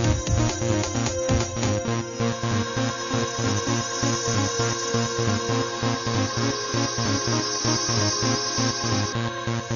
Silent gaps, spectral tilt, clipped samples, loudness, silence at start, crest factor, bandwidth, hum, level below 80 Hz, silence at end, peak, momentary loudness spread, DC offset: none; -4 dB/octave; under 0.1%; -24 LUFS; 0 s; 14 dB; 7.4 kHz; none; -40 dBFS; 0 s; -10 dBFS; 4 LU; under 0.1%